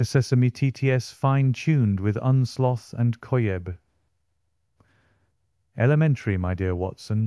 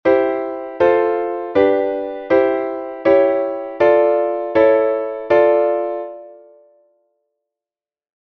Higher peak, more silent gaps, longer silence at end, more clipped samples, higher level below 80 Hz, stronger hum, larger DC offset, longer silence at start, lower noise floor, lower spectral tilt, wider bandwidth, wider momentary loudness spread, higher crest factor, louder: second, -8 dBFS vs -2 dBFS; neither; second, 0 s vs 1.9 s; neither; about the same, -58 dBFS vs -56 dBFS; neither; neither; about the same, 0 s vs 0.05 s; second, -75 dBFS vs under -90 dBFS; about the same, -7.5 dB/octave vs -7.5 dB/octave; first, 12 kHz vs 5.8 kHz; second, 7 LU vs 11 LU; about the same, 16 dB vs 16 dB; second, -23 LUFS vs -17 LUFS